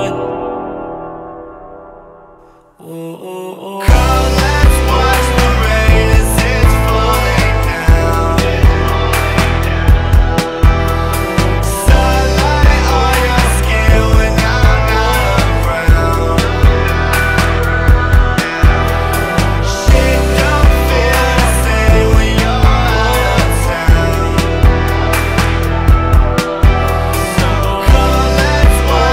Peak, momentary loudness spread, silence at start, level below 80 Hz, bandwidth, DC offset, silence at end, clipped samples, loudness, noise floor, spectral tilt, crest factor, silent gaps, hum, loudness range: 0 dBFS; 4 LU; 0 s; -14 dBFS; 16.5 kHz; under 0.1%; 0 s; under 0.1%; -12 LUFS; -42 dBFS; -5.5 dB/octave; 10 dB; none; none; 2 LU